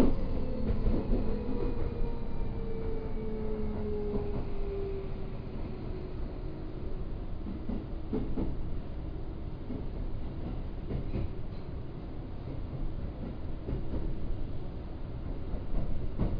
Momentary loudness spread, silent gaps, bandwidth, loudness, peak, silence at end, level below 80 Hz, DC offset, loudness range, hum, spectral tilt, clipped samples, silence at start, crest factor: 7 LU; none; 5 kHz; -38 LUFS; -12 dBFS; 0 s; -36 dBFS; under 0.1%; 4 LU; none; -10.5 dB/octave; under 0.1%; 0 s; 20 dB